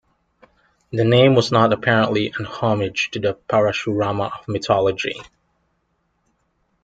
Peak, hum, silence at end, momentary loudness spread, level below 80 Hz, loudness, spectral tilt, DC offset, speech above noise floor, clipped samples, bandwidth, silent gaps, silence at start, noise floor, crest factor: -2 dBFS; none; 1.6 s; 11 LU; -56 dBFS; -19 LUFS; -6 dB/octave; under 0.1%; 50 dB; under 0.1%; 9 kHz; none; 0.9 s; -68 dBFS; 18 dB